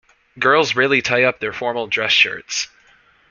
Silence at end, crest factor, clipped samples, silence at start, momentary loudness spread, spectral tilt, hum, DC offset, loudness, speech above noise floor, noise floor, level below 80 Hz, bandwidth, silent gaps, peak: 0.65 s; 18 dB; under 0.1%; 0.35 s; 10 LU; -2.5 dB/octave; none; under 0.1%; -17 LUFS; 36 dB; -54 dBFS; -60 dBFS; 7.4 kHz; none; -2 dBFS